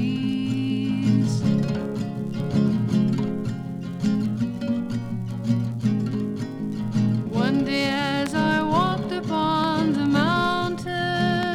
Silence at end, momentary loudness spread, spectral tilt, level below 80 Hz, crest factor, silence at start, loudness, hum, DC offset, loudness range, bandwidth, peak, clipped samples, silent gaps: 0 s; 8 LU; -6.5 dB/octave; -52 dBFS; 14 dB; 0 s; -24 LUFS; none; under 0.1%; 4 LU; 12.5 kHz; -8 dBFS; under 0.1%; none